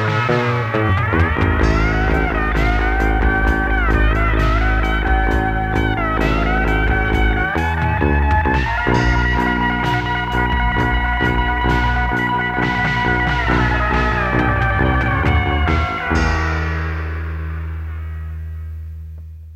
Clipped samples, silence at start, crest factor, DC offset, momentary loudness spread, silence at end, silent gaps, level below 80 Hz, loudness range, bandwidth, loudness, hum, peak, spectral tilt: under 0.1%; 0 s; 14 dB; under 0.1%; 9 LU; 0 s; none; -22 dBFS; 2 LU; 8 kHz; -17 LUFS; none; -2 dBFS; -7 dB/octave